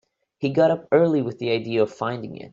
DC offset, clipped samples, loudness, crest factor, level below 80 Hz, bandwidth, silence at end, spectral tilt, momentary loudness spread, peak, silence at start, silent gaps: under 0.1%; under 0.1%; -22 LUFS; 16 dB; -66 dBFS; 7.6 kHz; 0.05 s; -7.5 dB/octave; 10 LU; -6 dBFS; 0.4 s; none